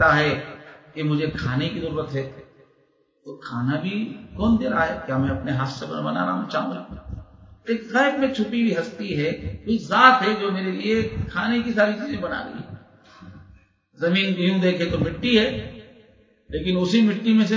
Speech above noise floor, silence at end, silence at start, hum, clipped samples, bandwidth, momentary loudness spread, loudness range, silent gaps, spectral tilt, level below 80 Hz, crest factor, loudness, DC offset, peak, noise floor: 41 dB; 0 s; 0 s; none; under 0.1%; 7.6 kHz; 16 LU; 7 LU; none; -6.5 dB/octave; -44 dBFS; 22 dB; -22 LUFS; under 0.1%; 0 dBFS; -63 dBFS